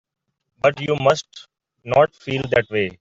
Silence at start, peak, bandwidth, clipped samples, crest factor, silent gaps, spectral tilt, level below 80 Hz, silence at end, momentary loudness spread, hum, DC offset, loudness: 0.65 s; -2 dBFS; 7.8 kHz; under 0.1%; 18 dB; none; -5.5 dB/octave; -54 dBFS; 0.1 s; 6 LU; none; under 0.1%; -20 LUFS